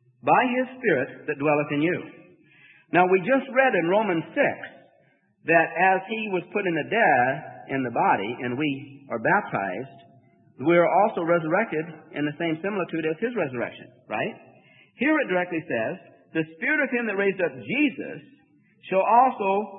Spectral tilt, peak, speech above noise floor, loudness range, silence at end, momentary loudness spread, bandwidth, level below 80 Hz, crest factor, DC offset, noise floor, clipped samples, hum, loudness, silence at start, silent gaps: -10.5 dB/octave; -6 dBFS; 39 dB; 5 LU; 0 s; 12 LU; 3.9 kHz; -74 dBFS; 20 dB; under 0.1%; -63 dBFS; under 0.1%; none; -24 LUFS; 0.25 s; none